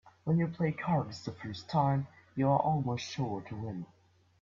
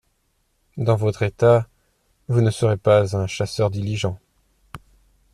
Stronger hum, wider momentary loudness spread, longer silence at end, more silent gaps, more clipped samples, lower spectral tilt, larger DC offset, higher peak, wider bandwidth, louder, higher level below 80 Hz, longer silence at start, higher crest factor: neither; first, 13 LU vs 10 LU; about the same, 0.55 s vs 0.55 s; neither; neither; about the same, -7.5 dB/octave vs -6.5 dB/octave; neither; second, -14 dBFS vs -4 dBFS; second, 7.4 kHz vs 12 kHz; second, -33 LUFS vs -20 LUFS; second, -64 dBFS vs -52 dBFS; second, 0.05 s vs 0.75 s; about the same, 20 dB vs 18 dB